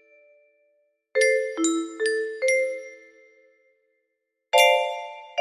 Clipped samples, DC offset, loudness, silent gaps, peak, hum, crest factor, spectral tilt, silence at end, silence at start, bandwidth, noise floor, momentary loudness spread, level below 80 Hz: under 0.1%; under 0.1%; -23 LUFS; none; -4 dBFS; none; 22 dB; 0 dB/octave; 0 s; 1.15 s; 15.5 kHz; -79 dBFS; 15 LU; -76 dBFS